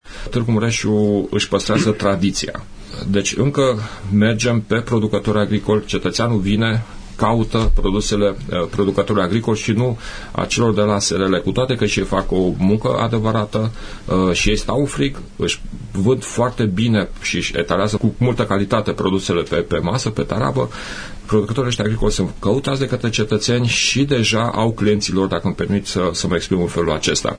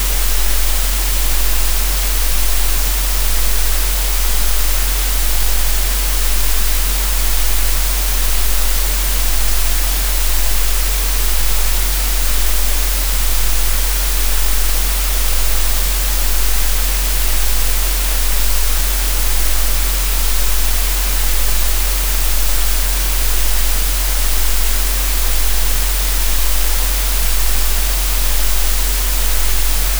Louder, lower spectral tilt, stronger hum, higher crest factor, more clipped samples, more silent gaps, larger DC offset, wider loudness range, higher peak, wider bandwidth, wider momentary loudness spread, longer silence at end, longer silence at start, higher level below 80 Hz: about the same, -18 LUFS vs -16 LUFS; first, -5 dB/octave vs -2 dB/octave; neither; about the same, 16 dB vs 12 dB; neither; neither; neither; about the same, 2 LU vs 0 LU; about the same, -2 dBFS vs -2 dBFS; second, 10.5 kHz vs over 20 kHz; first, 6 LU vs 0 LU; about the same, 0 s vs 0 s; about the same, 0.05 s vs 0 s; second, -30 dBFS vs -16 dBFS